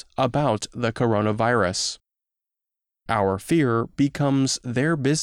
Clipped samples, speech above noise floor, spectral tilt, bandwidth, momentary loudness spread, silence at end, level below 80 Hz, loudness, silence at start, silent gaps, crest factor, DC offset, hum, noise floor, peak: under 0.1%; 65 dB; -5 dB/octave; 16 kHz; 5 LU; 0 s; -54 dBFS; -23 LUFS; 0.2 s; none; 16 dB; under 0.1%; none; -87 dBFS; -8 dBFS